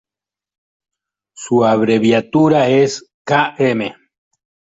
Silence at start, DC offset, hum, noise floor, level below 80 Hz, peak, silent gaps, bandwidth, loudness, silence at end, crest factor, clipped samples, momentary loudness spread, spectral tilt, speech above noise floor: 1.4 s; under 0.1%; none; -89 dBFS; -58 dBFS; -2 dBFS; 3.14-3.25 s; 8 kHz; -14 LUFS; 0.85 s; 16 dB; under 0.1%; 11 LU; -6 dB/octave; 75 dB